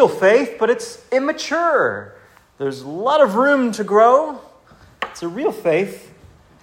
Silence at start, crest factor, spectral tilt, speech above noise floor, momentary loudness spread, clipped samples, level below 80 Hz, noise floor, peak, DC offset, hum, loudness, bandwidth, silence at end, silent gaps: 0 s; 18 dB; -5 dB/octave; 31 dB; 14 LU; under 0.1%; -60 dBFS; -48 dBFS; 0 dBFS; under 0.1%; none; -18 LUFS; 16 kHz; 0.65 s; none